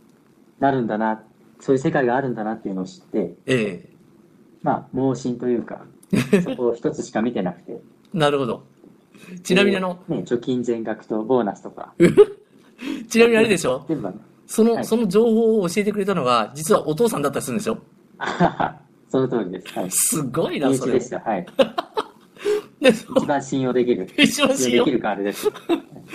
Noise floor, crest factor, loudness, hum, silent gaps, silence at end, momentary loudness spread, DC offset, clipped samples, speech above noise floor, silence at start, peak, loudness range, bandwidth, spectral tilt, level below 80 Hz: -54 dBFS; 20 dB; -21 LUFS; none; none; 0 s; 12 LU; under 0.1%; under 0.1%; 34 dB; 0.6 s; 0 dBFS; 5 LU; 15 kHz; -4.5 dB/octave; -58 dBFS